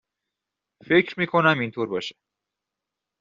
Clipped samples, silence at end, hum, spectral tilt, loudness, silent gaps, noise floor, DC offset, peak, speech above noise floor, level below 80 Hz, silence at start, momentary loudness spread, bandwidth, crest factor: under 0.1%; 1.1 s; 50 Hz at -55 dBFS; -3.5 dB/octave; -22 LUFS; none; -86 dBFS; under 0.1%; -4 dBFS; 63 dB; -68 dBFS; 0.85 s; 10 LU; 7.4 kHz; 22 dB